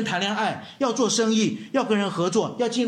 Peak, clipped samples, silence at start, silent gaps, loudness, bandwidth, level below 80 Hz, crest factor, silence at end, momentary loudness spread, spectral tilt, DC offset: -10 dBFS; under 0.1%; 0 s; none; -23 LUFS; 12 kHz; -70 dBFS; 14 dB; 0 s; 6 LU; -4 dB/octave; under 0.1%